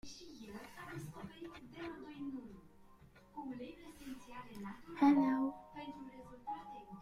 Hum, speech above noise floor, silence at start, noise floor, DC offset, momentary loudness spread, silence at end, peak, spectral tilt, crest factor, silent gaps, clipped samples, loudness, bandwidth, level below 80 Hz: none; 25 dB; 0.05 s; -62 dBFS; under 0.1%; 20 LU; 0 s; -18 dBFS; -6 dB/octave; 22 dB; none; under 0.1%; -40 LUFS; 13.5 kHz; -68 dBFS